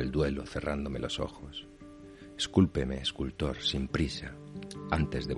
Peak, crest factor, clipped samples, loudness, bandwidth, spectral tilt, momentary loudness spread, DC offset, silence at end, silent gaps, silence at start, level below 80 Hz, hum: -10 dBFS; 22 dB; under 0.1%; -32 LUFS; 11.5 kHz; -5.5 dB/octave; 17 LU; under 0.1%; 0 s; none; 0 s; -44 dBFS; none